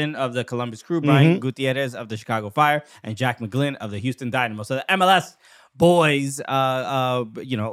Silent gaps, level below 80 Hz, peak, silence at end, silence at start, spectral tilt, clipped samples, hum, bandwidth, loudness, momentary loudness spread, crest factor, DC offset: none; -64 dBFS; -2 dBFS; 0 s; 0 s; -5.5 dB/octave; under 0.1%; none; 15 kHz; -21 LUFS; 12 LU; 20 dB; under 0.1%